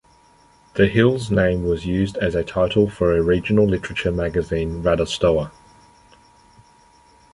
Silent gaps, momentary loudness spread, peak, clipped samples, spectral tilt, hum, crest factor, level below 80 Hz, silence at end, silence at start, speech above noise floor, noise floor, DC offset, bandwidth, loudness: none; 5 LU; -2 dBFS; under 0.1%; -7 dB/octave; none; 20 dB; -38 dBFS; 1.85 s; 0.75 s; 35 dB; -53 dBFS; under 0.1%; 11.5 kHz; -20 LUFS